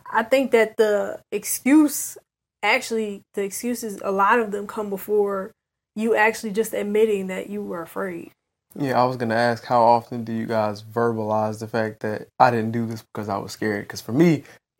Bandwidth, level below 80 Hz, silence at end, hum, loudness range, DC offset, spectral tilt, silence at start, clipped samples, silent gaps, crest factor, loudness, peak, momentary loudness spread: 16.5 kHz; -66 dBFS; 0.3 s; none; 2 LU; under 0.1%; -5 dB/octave; 0.05 s; under 0.1%; none; 20 dB; -22 LUFS; -2 dBFS; 12 LU